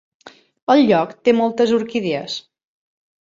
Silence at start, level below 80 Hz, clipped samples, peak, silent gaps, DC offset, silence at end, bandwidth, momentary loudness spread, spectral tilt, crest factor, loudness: 0.25 s; -62 dBFS; under 0.1%; -2 dBFS; 0.62-0.67 s; under 0.1%; 0.95 s; 7.6 kHz; 15 LU; -5.5 dB/octave; 16 dB; -17 LUFS